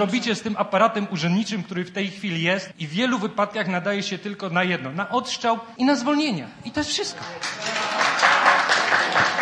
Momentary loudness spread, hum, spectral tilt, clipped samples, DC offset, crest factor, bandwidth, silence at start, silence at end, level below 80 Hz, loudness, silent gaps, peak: 11 LU; none; -4 dB/octave; under 0.1%; under 0.1%; 20 dB; 10.5 kHz; 0 s; 0 s; -64 dBFS; -22 LUFS; none; -2 dBFS